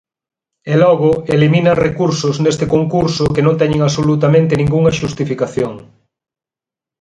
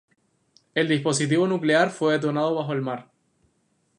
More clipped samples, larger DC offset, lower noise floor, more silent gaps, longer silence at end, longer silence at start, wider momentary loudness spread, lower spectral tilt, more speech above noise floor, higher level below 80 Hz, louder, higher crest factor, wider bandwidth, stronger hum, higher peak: neither; neither; first, -89 dBFS vs -69 dBFS; neither; first, 1.2 s vs 0.95 s; about the same, 0.65 s vs 0.75 s; about the same, 7 LU vs 9 LU; first, -6.5 dB/octave vs -5 dB/octave; first, 76 dB vs 46 dB; first, -40 dBFS vs -74 dBFS; first, -14 LUFS vs -23 LUFS; about the same, 14 dB vs 18 dB; second, 9.4 kHz vs 11.5 kHz; neither; first, 0 dBFS vs -6 dBFS